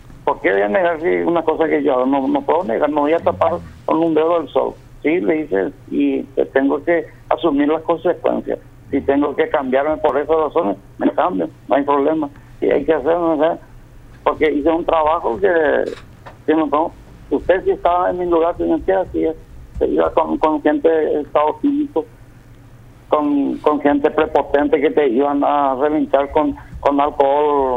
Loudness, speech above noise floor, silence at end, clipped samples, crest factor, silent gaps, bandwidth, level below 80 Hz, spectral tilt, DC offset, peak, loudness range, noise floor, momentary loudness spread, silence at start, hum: -17 LUFS; 25 dB; 0 s; under 0.1%; 16 dB; none; 5.6 kHz; -42 dBFS; -7.5 dB/octave; under 0.1%; 0 dBFS; 2 LU; -42 dBFS; 7 LU; 0.05 s; none